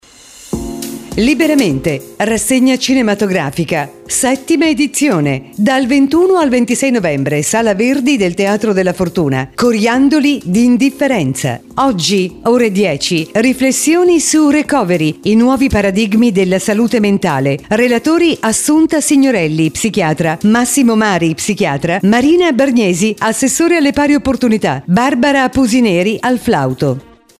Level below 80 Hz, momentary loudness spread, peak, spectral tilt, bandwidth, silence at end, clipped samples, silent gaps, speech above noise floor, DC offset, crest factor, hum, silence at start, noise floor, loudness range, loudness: -40 dBFS; 5 LU; 0 dBFS; -4.5 dB/octave; 15.5 kHz; 0.4 s; under 0.1%; none; 26 dB; under 0.1%; 12 dB; none; 0.4 s; -38 dBFS; 2 LU; -12 LUFS